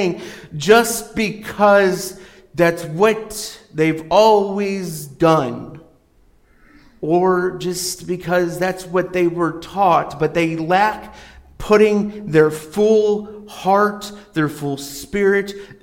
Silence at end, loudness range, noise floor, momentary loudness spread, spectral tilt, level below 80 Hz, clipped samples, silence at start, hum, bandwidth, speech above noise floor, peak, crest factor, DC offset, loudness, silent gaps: 0.1 s; 4 LU; -54 dBFS; 15 LU; -5 dB/octave; -48 dBFS; under 0.1%; 0 s; none; 17 kHz; 36 dB; -2 dBFS; 16 dB; under 0.1%; -17 LUFS; none